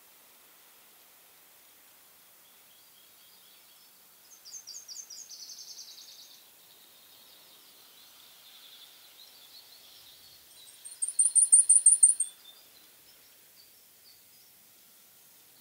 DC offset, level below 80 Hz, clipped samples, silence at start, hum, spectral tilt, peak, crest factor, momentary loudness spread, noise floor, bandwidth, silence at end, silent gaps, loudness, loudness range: under 0.1%; -90 dBFS; under 0.1%; 4.55 s; none; 4 dB/octave; -6 dBFS; 28 dB; 32 LU; -58 dBFS; 16 kHz; 3.3 s; none; -20 LUFS; 24 LU